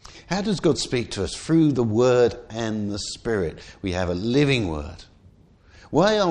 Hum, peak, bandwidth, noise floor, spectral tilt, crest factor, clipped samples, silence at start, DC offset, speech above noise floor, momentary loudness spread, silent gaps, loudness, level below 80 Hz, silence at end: none; -4 dBFS; 11 kHz; -53 dBFS; -5.5 dB/octave; 18 dB; under 0.1%; 0.1 s; under 0.1%; 31 dB; 10 LU; none; -23 LUFS; -44 dBFS; 0 s